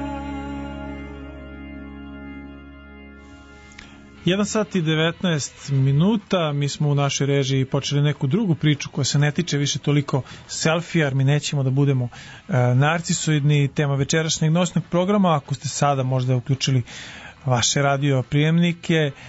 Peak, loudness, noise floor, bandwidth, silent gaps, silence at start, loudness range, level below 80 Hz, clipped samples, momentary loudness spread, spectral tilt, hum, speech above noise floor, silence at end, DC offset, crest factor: -6 dBFS; -21 LUFS; -44 dBFS; 8 kHz; none; 0 s; 9 LU; -48 dBFS; under 0.1%; 17 LU; -5 dB/octave; none; 23 dB; 0 s; under 0.1%; 16 dB